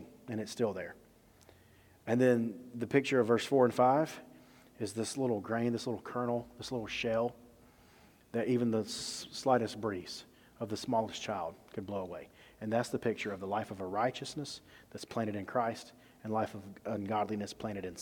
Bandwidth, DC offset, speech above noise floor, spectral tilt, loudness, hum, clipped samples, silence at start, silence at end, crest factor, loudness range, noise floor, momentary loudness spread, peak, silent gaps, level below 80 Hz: 18.5 kHz; under 0.1%; 28 dB; -5.5 dB/octave; -35 LUFS; none; under 0.1%; 0 s; 0 s; 22 dB; 7 LU; -62 dBFS; 16 LU; -12 dBFS; none; -70 dBFS